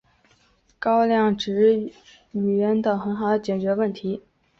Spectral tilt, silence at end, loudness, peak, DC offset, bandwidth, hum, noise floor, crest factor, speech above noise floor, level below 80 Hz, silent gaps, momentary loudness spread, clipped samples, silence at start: -7 dB/octave; 0.4 s; -22 LUFS; -8 dBFS; under 0.1%; 7.4 kHz; none; -61 dBFS; 14 dB; 40 dB; -60 dBFS; none; 11 LU; under 0.1%; 0.8 s